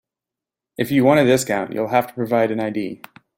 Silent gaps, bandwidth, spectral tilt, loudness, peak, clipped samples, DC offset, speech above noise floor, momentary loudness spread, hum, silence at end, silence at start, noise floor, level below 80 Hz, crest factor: none; 16.5 kHz; -5.5 dB/octave; -19 LUFS; -2 dBFS; under 0.1%; under 0.1%; 69 dB; 14 LU; none; 0.4 s; 0.8 s; -87 dBFS; -60 dBFS; 18 dB